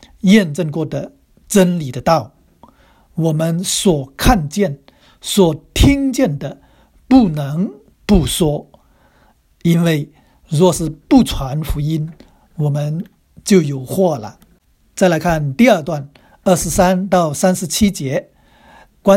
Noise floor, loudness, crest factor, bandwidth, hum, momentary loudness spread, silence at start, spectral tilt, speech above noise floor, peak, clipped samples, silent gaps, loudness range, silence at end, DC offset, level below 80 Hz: -54 dBFS; -16 LUFS; 16 dB; 16.5 kHz; none; 14 LU; 0.25 s; -5.5 dB/octave; 40 dB; 0 dBFS; under 0.1%; none; 3 LU; 0 s; under 0.1%; -30 dBFS